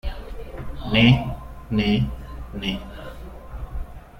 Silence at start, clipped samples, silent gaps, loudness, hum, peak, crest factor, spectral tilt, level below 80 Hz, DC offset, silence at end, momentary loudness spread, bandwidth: 0.05 s; under 0.1%; none; -21 LUFS; none; -4 dBFS; 20 dB; -7 dB/octave; -34 dBFS; under 0.1%; 0 s; 21 LU; 15.5 kHz